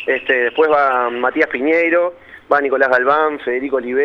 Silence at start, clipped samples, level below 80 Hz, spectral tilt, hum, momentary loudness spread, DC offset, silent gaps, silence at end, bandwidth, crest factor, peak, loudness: 0 s; under 0.1%; -58 dBFS; -5.5 dB/octave; none; 6 LU; under 0.1%; none; 0 s; 6.4 kHz; 16 dB; 0 dBFS; -15 LUFS